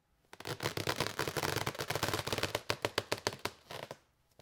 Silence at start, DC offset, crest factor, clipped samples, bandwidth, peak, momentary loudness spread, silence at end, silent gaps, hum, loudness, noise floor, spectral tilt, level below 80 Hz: 0.4 s; under 0.1%; 30 dB; under 0.1%; 19 kHz; -8 dBFS; 12 LU; 0.45 s; none; none; -37 LUFS; -57 dBFS; -3 dB/octave; -64 dBFS